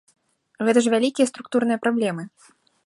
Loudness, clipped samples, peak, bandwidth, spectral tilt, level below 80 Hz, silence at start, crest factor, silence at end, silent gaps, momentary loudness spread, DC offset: -21 LUFS; under 0.1%; -6 dBFS; 11.5 kHz; -4.5 dB/octave; -74 dBFS; 0.6 s; 18 dB; 0.6 s; none; 9 LU; under 0.1%